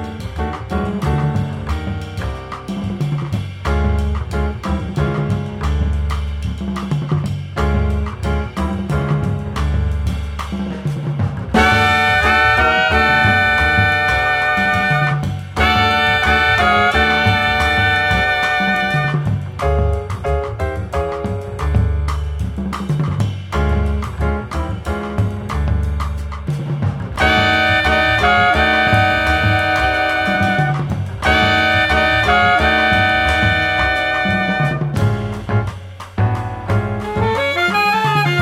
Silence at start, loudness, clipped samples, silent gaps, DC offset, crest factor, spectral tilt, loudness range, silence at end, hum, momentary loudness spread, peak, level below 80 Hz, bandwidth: 0 s; -16 LUFS; under 0.1%; none; under 0.1%; 16 dB; -5.5 dB/octave; 8 LU; 0 s; none; 11 LU; 0 dBFS; -26 dBFS; 14 kHz